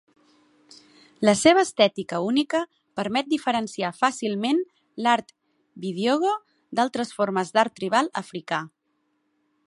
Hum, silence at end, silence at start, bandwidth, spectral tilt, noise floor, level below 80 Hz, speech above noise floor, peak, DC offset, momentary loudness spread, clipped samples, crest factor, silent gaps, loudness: none; 1 s; 1.2 s; 11.5 kHz; -4 dB/octave; -72 dBFS; -68 dBFS; 49 dB; -4 dBFS; under 0.1%; 12 LU; under 0.1%; 22 dB; none; -24 LUFS